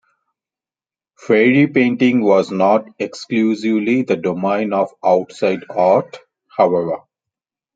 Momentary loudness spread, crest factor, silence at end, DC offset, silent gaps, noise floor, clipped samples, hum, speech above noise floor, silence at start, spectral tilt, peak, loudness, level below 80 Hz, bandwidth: 9 LU; 16 dB; 0.75 s; under 0.1%; none; under -90 dBFS; under 0.1%; none; over 74 dB; 1.25 s; -7 dB/octave; -2 dBFS; -16 LUFS; -64 dBFS; 7.8 kHz